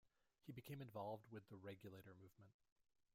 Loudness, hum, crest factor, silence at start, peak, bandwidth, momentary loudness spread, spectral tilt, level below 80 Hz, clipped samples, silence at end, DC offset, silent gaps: -57 LUFS; none; 18 dB; 0.05 s; -40 dBFS; 16 kHz; 13 LU; -7 dB/octave; -88 dBFS; under 0.1%; 0.35 s; under 0.1%; 2.54-2.59 s, 2.72-2.76 s